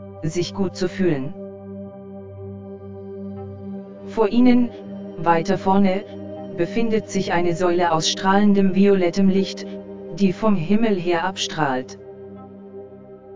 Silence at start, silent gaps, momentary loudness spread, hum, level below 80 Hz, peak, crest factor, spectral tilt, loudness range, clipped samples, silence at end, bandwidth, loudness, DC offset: 0 s; none; 20 LU; none; -52 dBFS; -2 dBFS; 18 dB; -6 dB/octave; 9 LU; under 0.1%; 0 s; 7.6 kHz; -20 LUFS; under 0.1%